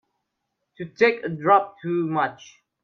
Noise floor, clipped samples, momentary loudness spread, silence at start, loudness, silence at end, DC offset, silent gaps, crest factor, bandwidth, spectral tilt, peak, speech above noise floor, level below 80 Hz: -79 dBFS; under 0.1%; 12 LU; 0.8 s; -22 LUFS; 0.4 s; under 0.1%; none; 20 dB; 6.8 kHz; -6.5 dB/octave; -4 dBFS; 56 dB; -72 dBFS